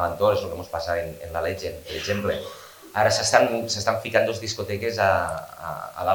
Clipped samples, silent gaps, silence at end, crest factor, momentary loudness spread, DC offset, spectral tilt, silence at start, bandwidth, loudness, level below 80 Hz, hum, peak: under 0.1%; none; 0 s; 24 dB; 13 LU; under 0.1%; -3.5 dB/octave; 0 s; 19.5 kHz; -24 LUFS; -50 dBFS; none; 0 dBFS